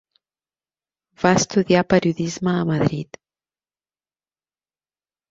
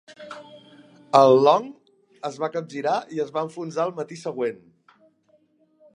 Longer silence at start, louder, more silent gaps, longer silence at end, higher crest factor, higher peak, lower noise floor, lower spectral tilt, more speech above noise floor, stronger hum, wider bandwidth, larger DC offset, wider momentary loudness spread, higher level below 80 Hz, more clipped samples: first, 1.2 s vs 0.1 s; first, -19 LUFS vs -22 LUFS; neither; first, 2.25 s vs 1.4 s; about the same, 22 dB vs 22 dB; about the same, -2 dBFS vs -2 dBFS; first, under -90 dBFS vs -63 dBFS; about the same, -5.5 dB/octave vs -6 dB/octave; first, over 71 dB vs 41 dB; neither; second, 7.8 kHz vs 10.5 kHz; neither; second, 7 LU vs 25 LU; first, -54 dBFS vs -78 dBFS; neither